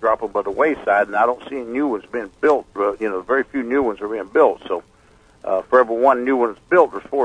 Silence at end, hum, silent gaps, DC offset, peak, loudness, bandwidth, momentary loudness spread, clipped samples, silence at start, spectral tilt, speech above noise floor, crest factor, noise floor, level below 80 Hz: 0 s; none; none; under 0.1%; 0 dBFS; -19 LUFS; 9.8 kHz; 10 LU; under 0.1%; 0 s; -6.5 dB/octave; 33 dB; 18 dB; -52 dBFS; -54 dBFS